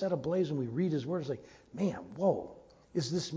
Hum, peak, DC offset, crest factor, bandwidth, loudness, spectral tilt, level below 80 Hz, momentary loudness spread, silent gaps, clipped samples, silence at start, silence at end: none; -16 dBFS; under 0.1%; 18 dB; 8 kHz; -34 LUFS; -6.5 dB/octave; -66 dBFS; 9 LU; none; under 0.1%; 0 s; 0 s